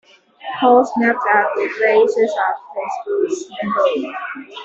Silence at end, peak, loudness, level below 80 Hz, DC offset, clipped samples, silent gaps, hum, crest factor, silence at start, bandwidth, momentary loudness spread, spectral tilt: 0 s; -2 dBFS; -17 LUFS; -66 dBFS; under 0.1%; under 0.1%; none; none; 16 dB; 0.4 s; 8 kHz; 13 LU; -4.5 dB/octave